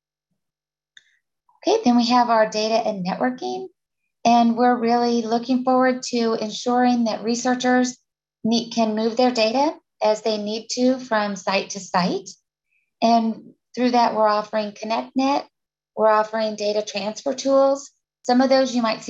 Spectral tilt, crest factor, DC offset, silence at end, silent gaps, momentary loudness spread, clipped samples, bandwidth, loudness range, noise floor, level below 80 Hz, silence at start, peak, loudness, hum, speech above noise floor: -4 dB/octave; 16 dB; under 0.1%; 0 s; none; 9 LU; under 0.1%; 8 kHz; 3 LU; -89 dBFS; -70 dBFS; 1.65 s; -4 dBFS; -21 LUFS; none; 69 dB